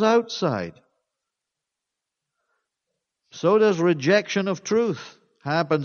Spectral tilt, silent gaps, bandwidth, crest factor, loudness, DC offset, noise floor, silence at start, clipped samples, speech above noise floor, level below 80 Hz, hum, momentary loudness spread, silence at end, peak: -5.5 dB/octave; none; 7 kHz; 18 dB; -22 LUFS; under 0.1%; -85 dBFS; 0 s; under 0.1%; 63 dB; -70 dBFS; none; 12 LU; 0 s; -6 dBFS